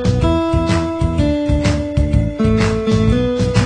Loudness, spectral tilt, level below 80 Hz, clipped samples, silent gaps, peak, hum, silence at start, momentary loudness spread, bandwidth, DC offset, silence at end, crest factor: -16 LUFS; -7 dB/octave; -22 dBFS; under 0.1%; none; -2 dBFS; none; 0 s; 2 LU; 10 kHz; under 0.1%; 0 s; 14 dB